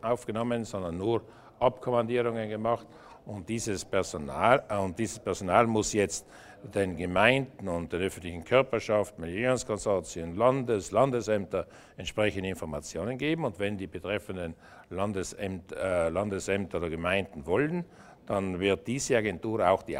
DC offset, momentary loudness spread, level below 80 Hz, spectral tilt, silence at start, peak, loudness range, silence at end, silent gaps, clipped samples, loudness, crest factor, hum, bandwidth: under 0.1%; 11 LU; -54 dBFS; -5 dB/octave; 0.05 s; -6 dBFS; 5 LU; 0 s; none; under 0.1%; -30 LUFS; 24 dB; none; 16 kHz